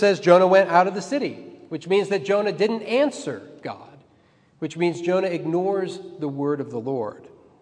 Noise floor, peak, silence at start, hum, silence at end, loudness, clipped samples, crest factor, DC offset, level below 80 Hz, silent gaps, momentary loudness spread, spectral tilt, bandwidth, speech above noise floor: -58 dBFS; 0 dBFS; 0 s; none; 0.35 s; -22 LUFS; under 0.1%; 22 dB; under 0.1%; -76 dBFS; none; 19 LU; -6 dB/octave; 10 kHz; 37 dB